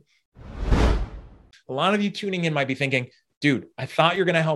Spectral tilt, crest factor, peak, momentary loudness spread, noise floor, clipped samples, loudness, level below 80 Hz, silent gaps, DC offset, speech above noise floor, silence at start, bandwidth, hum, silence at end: -6 dB/octave; 22 dB; -2 dBFS; 13 LU; -48 dBFS; under 0.1%; -23 LUFS; -32 dBFS; 3.37-3.41 s; under 0.1%; 25 dB; 0.4 s; 12 kHz; none; 0 s